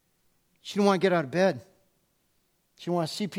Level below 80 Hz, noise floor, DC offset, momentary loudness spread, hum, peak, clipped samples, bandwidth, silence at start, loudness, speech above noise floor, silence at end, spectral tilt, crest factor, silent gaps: -74 dBFS; -71 dBFS; under 0.1%; 17 LU; none; -10 dBFS; under 0.1%; 15.5 kHz; 0.65 s; -26 LUFS; 46 dB; 0 s; -6 dB/octave; 20 dB; none